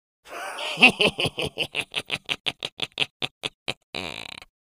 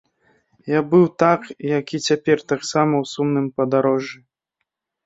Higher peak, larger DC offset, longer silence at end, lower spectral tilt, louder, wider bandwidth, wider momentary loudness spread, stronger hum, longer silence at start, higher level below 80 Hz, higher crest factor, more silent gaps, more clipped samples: about the same, 0 dBFS vs 0 dBFS; neither; second, 0.25 s vs 0.9 s; second, -3 dB/octave vs -6 dB/octave; second, -24 LUFS vs -19 LUFS; first, 15.5 kHz vs 8 kHz; first, 18 LU vs 7 LU; neither; second, 0.25 s vs 0.65 s; first, -58 dBFS vs -64 dBFS; first, 26 dB vs 20 dB; first, 2.40-2.44 s, 2.72-2.77 s, 3.11-3.20 s, 3.31-3.41 s, 3.54-3.66 s, 3.77-3.93 s vs none; neither